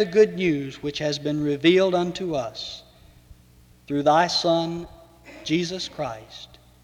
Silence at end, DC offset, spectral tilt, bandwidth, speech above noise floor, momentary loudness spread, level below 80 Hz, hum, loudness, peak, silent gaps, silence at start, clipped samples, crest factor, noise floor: 0.4 s; under 0.1%; -5 dB/octave; 13 kHz; 31 dB; 17 LU; -56 dBFS; none; -23 LUFS; -4 dBFS; none; 0 s; under 0.1%; 20 dB; -53 dBFS